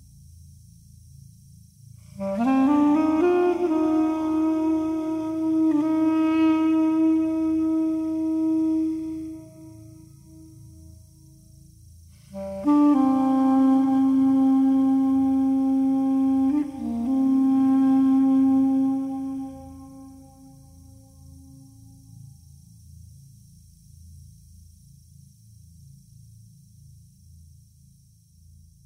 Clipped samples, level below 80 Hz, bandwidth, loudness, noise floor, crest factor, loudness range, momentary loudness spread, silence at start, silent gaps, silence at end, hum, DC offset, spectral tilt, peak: under 0.1%; -56 dBFS; 10 kHz; -22 LUFS; -55 dBFS; 14 dB; 10 LU; 12 LU; 2.15 s; none; 6.65 s; none; under 0.1%; -7.5 dB/octave; -10 dBFS